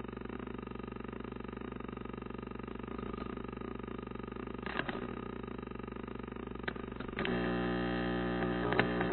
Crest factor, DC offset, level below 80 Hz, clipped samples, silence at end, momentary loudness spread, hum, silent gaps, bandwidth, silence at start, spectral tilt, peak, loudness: 28 dB; under 0.1%; -52 dBFS; under 0.1%; 0 s; 10 LU; 60 Hz at -50 dBFS; none; 4.2 kHz; 0 s; -5 dB/octave; -10 dBFS; -39 LUFS